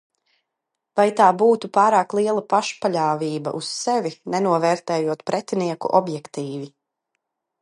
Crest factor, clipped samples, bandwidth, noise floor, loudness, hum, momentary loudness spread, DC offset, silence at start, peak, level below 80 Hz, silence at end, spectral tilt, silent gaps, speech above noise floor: 20 dB; under 0.1%; 11.5 kHz; -81 dBFS; -21 LUFS; none; 14 LU; under 0.1%; 0.95 s; -2 dBFS; -74 dBFS; 0.95 s; -5 dB/octave; none; 61 dB